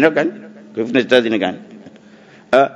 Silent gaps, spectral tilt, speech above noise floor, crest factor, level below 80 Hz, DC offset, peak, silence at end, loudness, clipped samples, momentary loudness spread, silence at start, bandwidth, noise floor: none; -5.5 dB/octave; 28 dB; 18 dB; -64 dBFS; under 0.1%; 0 dBFS; 0 s; -17 LUFS; under 0.1%; 17 LU; 0 s; 12 kHz; -44 dBFS